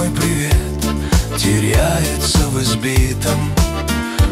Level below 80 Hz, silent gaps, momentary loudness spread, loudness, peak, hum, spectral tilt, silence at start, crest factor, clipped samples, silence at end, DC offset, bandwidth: -20 dBFS; none; 3 LU; -16 LUFS; -2 dBFS; none; -4.5 dB/octave; 0 s; 12 dB; under 0.1%; 0 s; under 0.1%; 16 kHz